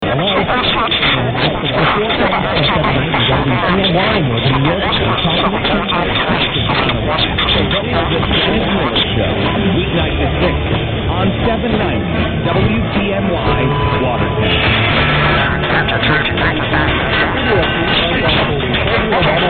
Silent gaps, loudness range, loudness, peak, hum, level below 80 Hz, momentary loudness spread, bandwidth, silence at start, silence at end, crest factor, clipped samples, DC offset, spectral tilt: none; 2 LU; -14 LUFS; 0 dBFS; none; -26 dBFS; 3 LU; 4.7 kHz; 0 s; 0 s; 14 dB; under 0.1%; under 0.1%; -9.5 dB/octave